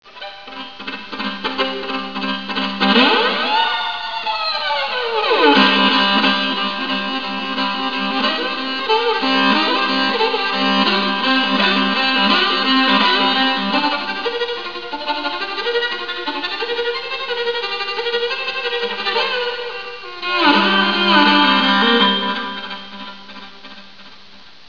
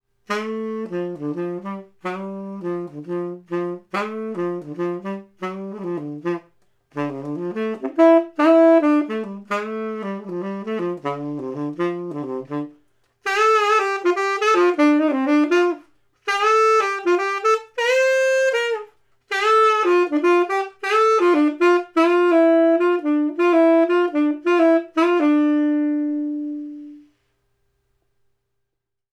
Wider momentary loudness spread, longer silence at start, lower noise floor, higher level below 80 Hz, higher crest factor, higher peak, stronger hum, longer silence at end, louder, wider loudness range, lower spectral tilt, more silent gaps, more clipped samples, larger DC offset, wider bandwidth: about the same, 14 LU vs 14 LU; second, 0.05 s vs 0.3 s; second, -44 dBFS vs -78 dBFS; first, -60 dBFS vs -76 dBFS; about the same, 18 dB vs 16 dB; first, 0 dBFS vs -4 dBFS; neither; second, 0.2 s vs 2.15 s; first, -16 LUFS vs -19 LUFS; second, 6 LU vs 11 LU; about the same, -4.5 dB/octave vs -5.5 dB/octave; neither; neither; first, 1% vs under 0.1%; second, 5.4 kHz vs 11 kHz